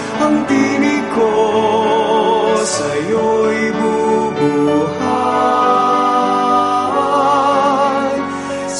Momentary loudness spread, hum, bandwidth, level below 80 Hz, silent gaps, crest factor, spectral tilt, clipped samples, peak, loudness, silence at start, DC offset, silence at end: 4 LU; none; 11.5 kHz; -52 dBFS; none; 12 dB; -4.5 dB/octave; under 0.1%; -2 dBFS; -14 LUFS; 0 s; 0.1%; 0 s